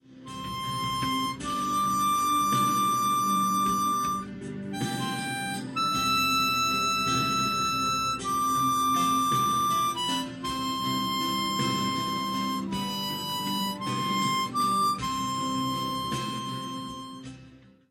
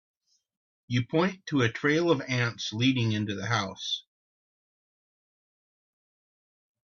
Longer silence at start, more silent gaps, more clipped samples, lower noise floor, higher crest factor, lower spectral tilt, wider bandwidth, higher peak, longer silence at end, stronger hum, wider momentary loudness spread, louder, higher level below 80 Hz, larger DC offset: second, 0.1 s vs 0.9 s; neither; neither; second, -52 dBFS vs under -90 dBFS; second, 14 dB vs 20 dB; second, -3 dB/octave vs -5.5 dB/octave; first, 17 kHz vs 7.2 kHz; second, -14 dBFS vs -10 dBFS; second, 0.35 s vs 2.95 s; neither; first, 9 LU vs 6 LU; about the same, -27 LUFS vs -28 LUFS; first, -56 dBFS vs -66 dBFS; neither